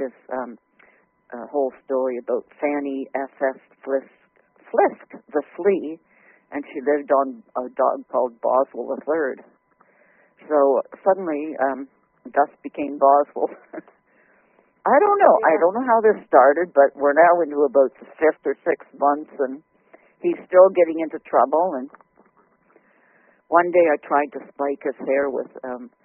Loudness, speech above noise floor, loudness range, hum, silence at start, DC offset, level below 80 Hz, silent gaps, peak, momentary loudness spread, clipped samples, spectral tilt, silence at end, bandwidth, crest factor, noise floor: -20 LUFS; 39 dB; 8 LU; none; 0 s; under 0.1%; -72 dBFS; none; 0 dBFS; 16 LU; under 0.1%; 1 dB/octave; 0.2 s; 3.2 kHz; 20 dB; -60 dBFS